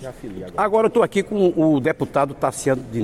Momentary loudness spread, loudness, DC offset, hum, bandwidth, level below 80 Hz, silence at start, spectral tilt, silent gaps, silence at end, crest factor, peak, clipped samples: 8 LU; -20 LUFS; under 0.1%; none; 14.5 kHz; -50 dBFS; 0 s; -6 dB/octave; none; 0 s; 14 dB; -6 dBFS; under 0.1%